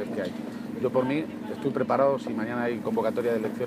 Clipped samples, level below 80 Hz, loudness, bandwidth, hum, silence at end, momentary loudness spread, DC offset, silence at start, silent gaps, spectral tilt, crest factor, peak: under 0.1%; -68 dBFS; -28 LUFS; 15.5 kHz; none; 0 s; 10 LU; under 0.1%; 0 s; none; -7 dB/octave; 16 dB; -12 dBFS